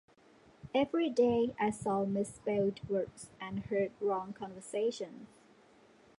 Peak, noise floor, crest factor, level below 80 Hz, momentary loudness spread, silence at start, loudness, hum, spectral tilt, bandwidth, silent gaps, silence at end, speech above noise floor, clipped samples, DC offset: -18 dBFS; -63 dBFS; 18 dB; -68 dBFS; 14 LU; 0.65 s; -34 LUFS; none; -6 dB/octave; 11.5 kHz; none; 0.9 s; 29 dB; under 0.1%; under 0.1%